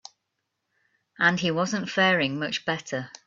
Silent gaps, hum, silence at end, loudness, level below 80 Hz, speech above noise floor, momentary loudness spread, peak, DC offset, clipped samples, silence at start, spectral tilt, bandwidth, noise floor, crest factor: none; none; 0.15 s; -24 LUFS; -68 dBFS; 55 dB; 8 LU; -6 dBFS; under 0.1%; under 0.1%; 1.2 s; -4.5 dB/octave; 7.6 kHz; -80 dBFS; 20 dB